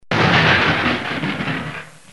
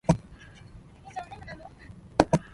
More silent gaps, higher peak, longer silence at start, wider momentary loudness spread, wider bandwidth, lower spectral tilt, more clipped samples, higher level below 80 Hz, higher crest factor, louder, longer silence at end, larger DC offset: neither; about the same, -2 dBFS vs 0 dBFS; about the same, 0.1 s vs 0.1 s; second, 14 LU vs 25 LU; about the same, 11.5 kHz vs 11.5 kHz; second, -5 dB/octave vs -6.5 dB/octave; neither; about the same, -44 dBFS vs -46 dBFS; second, 16 dB vs 30 dB; first, -17 LUFS vs -29 LUFS; about the same, 0.2 s vs 0.15 s; first, 0.6% vs under 0.1%